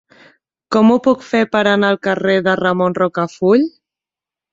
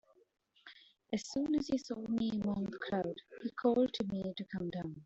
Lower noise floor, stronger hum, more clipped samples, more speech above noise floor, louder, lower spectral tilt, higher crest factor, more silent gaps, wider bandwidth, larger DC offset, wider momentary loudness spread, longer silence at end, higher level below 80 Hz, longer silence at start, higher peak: first, -88 dBFS vs -60 dBFS; neither; neither; first, 74 dB vs 24 dB; first, -15 LUFS vs -37 LUFS; about the same, -6.5 dB/octave vs -6 dB/octave; about the same, 14 dB vs 18 dB; neither; about the same, 7.8 kHz vs 8 kHz; neither; second, 5 LU vs 11 LU; first, 0.85 s vs 0 s; first, -58 dBFS vs -68 dBFS; about the same, 0.7 s vs 0.65 s; first, -2 dBFS vs -18 dBFS